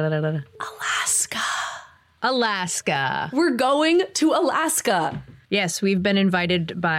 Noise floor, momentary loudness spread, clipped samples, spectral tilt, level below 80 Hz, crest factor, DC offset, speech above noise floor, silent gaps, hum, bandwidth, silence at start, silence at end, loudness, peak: -42 dBFS; 9 LU; under 0.1%; -3.5 dB/octave; -60 dBFS; 16 dB; under 0.1%; 21 dB; none; none; 16.5 kHz; 0 s; 0 s; -22 LUFS; -6 dBFS